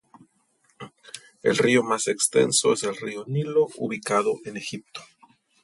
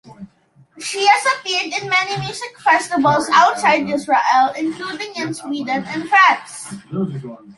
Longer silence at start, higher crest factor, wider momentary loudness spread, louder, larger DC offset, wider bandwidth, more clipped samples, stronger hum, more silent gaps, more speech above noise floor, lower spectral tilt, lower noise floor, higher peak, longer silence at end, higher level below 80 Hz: first, 0.8 s vs 0.05 s; about the same, 18 dB vs 16 dB; first, 22 LU vs 13 LU; second, -23 LUFS vs -17 LUFS; neither; about the same, 12 kHz vs 11.5 kHz; neither; neither; neither; first, 43 dB vs 36 dB; about the same, -3.5 dB/octave vs -3.5 dB/octave; first, -66 dBFS vs -53 dBFS; second, -8 dBFS vs -2 dBFS; first, 0.6 s vs 0.05 s; second, -70 dBFS vs -60 dBFS